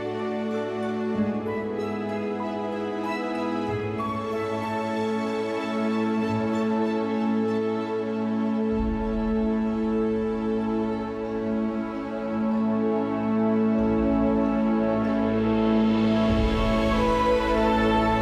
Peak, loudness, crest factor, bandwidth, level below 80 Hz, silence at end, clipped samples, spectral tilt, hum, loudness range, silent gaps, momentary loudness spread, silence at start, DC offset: -12 dBFS; -25 LUFS; 12 dB; 9.4 kHz; -40 dBFS; 0 s; under 0.1%; -7.5 dB/octave; none; 6 LU; none; 7 LU; 0 s; under 0.1%